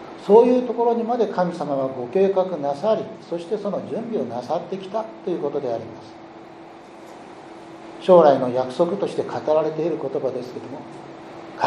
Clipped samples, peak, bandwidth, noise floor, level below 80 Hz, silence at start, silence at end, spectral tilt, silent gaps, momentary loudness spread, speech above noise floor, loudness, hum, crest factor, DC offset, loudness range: under 0.1%; -2 dBFS; 11 kHz; -42 dBFS; -70 dBFS; 0 s; 0 s; -7.5 dB/octave; none; 25 LU; 21 dB; -21 LUFS; none; 20 dB; under 0.1%; 9 LU